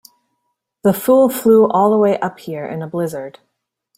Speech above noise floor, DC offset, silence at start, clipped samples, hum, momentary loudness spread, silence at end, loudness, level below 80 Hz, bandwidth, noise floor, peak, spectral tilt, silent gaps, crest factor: 58 dB; under 0.1%; 0.85 s; under 0.1%; none; 14 LU; 0.7 s; -15 LUFS; -60 dBFS; 16.5 kHz; -72 dBFS; -2 dBFS; -6.5 dB/octave; none; 14 dB